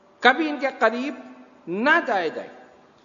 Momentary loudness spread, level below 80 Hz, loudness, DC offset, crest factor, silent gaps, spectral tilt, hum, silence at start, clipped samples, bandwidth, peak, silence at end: 21 LU; -76 dBFS; -22 LUFS; under 0.1%; 24 dB; none; -4.5 dB/octave; none; 0.2 s; under 0.1%; 7.4 kHz; 0 dBFS; 0.45 s